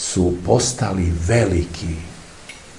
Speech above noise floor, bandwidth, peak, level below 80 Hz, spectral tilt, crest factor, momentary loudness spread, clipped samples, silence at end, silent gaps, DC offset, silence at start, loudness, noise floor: 21 dB; 11.5 kHz; 0 dBFS; -36 dBFS; -5 dB/octave; 20 dB; 20 LU; under 0.1%; 0 s; none; 0.3%; 0 s; -19 LUFS; -40 dBFS